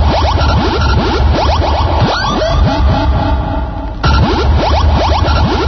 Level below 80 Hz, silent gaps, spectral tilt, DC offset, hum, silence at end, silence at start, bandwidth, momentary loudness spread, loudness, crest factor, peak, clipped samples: -14 dBFS; none; -6.5 dB/octave; under 0.1%; none; 0 s; 0 s; 6.4 kHz; 4 LU; -12 LUFS; 10 dB; 0 dBFS; under 0.1%